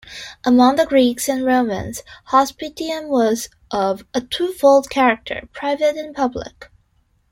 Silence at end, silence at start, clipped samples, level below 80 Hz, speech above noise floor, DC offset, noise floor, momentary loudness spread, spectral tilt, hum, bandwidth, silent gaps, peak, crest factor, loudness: 0.65 s; 0.05 s; under 0.1%; -50 dBFS; 43 dB; under 0.1%; -61 dBFS; 13 LU; -4 dB/octave; none; 16.5 kHz; none; -2 dBFS; 16 dB; -18 LUFS